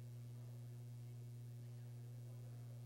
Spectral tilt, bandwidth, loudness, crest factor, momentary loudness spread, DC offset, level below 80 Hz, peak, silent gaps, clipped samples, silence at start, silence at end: -7 dB/octave; 16.5 kHz; -54 LUFS; 6 dB; 0 LU; under 0.1%; -76 dBFS; -46 dBFS; none; under 0.1%; 0 s; 0 s